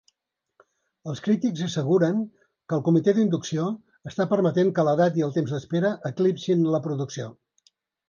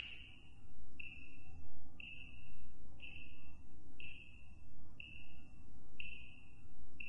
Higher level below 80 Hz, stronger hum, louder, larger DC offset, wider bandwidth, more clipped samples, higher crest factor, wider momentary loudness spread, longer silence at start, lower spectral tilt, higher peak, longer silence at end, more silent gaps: second, -68 dBFS vs -62 dBFS; neither; first, -24 LUFS vs -56 LUFS; neither; second, 7.2 kHz vs 10.5 kHz; neither; first, 16 dB vs 10 dB; about the same, 13 LU vs 12 LU; first, 1.05 s vs 0 s; first, -7 dB/octave vs -5 dB/octave; first, -8 dBFS vs -26 dBFS; first, 0.8 s vs 0 s; neither